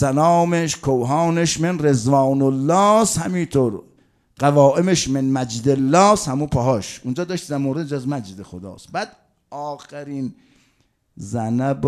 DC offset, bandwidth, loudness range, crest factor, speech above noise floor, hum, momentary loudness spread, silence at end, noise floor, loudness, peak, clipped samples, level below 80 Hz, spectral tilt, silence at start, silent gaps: under 0.1%; 14 kHz; 12 LU; 20 dB; 45 dB; none; 17 LU; 0 s; -63 dBFS; -19 LUFS; 0 dBFS; under 0.1%; -48 dBFS; -5.5 dB/octave; 0 s; none